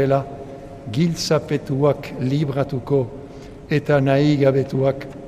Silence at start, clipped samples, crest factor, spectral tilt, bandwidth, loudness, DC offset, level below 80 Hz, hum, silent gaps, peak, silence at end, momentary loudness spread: 0 s; under 0.1%; 16 dB; -7 dB/octave; 14 kHz; -20 LUFS; under 0.1%; -46 dBFS; none; none; -4 dBFS; 0 s; 19 LU